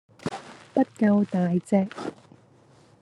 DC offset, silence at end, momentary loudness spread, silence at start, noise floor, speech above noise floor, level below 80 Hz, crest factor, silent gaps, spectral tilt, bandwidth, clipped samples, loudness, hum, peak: under 0.1%; 0.9 s; 15 LU; 0.25 s; -56 dBFS; 33 dB; -70 dBFS; 18 dB; none; -8 dB/octave; 11 kHz; under 0.1%; -25 LUFS; none; -8 dBFS